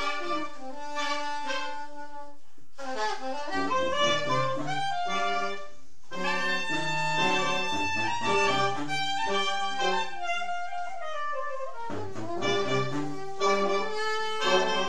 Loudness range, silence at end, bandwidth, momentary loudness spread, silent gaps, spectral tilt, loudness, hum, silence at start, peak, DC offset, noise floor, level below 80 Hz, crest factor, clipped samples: 5 LU; 0 s; 14 kHz; 12 LU; none; -3.5 dB/octave; -29 LUFS; none; 0 s; -10 dBFS; 3%; -57 dBFS; -66 dBFS; 18 dB; under 0.1%